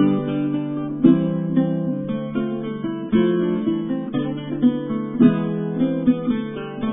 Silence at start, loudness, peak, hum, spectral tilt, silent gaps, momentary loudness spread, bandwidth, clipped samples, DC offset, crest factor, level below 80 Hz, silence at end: 0 s; -21 LUFS; -2 dBFS; none; -12 dB/octave; none; 9 LU; 3.9 kHz; under 0.1%; under 0.1%; 18 dB; -54 dBFS; 0 s